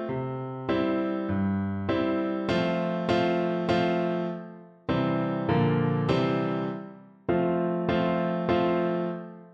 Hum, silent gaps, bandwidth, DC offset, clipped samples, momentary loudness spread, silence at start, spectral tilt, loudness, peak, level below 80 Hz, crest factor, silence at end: none; none; 7.8 kHz; under 0.1%; under 0.1%; 9 LU; 0 s; -8 dB/octave; -27 LUFS; -12 dBFS; -54 dBFS; 16 dB; 0 s